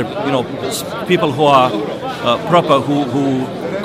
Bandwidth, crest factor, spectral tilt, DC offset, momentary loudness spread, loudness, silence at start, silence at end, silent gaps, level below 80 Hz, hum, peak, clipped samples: 16 kHz; 16 dB; -5.5 dB/octave; under 0.1%; 10 LU; -15 LUFS; 0 s; 0 s; none; -52 dBFS; none; 0 dBFS; under 0.1%